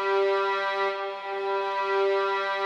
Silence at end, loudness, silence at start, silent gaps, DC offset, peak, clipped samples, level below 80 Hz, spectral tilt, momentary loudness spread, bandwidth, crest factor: 0 s; -26 LUFS; 0 s; none; under 0.1%; -14 dBFS; under 0.1%; under -90 dBFS; -3 dB/octave; 7 LU; 7.6 kHz; 12 dB